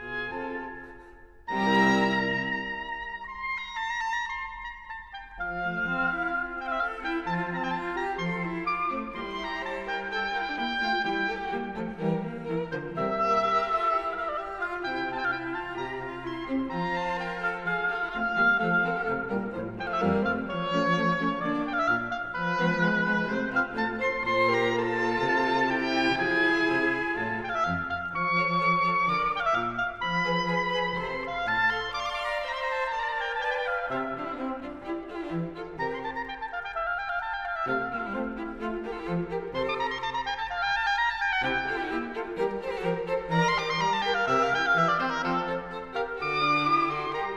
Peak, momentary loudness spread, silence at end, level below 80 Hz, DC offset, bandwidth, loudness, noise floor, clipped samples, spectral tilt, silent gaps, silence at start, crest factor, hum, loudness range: -10 dBFS; 10 LU; 0 s; -54 dBFS; 0.1%; 11 kHz; -28 LUFS; -50 dBFS; under 0.1%; -5.5 dB/octave; none; 0 s; 18 dB; none; 6 LU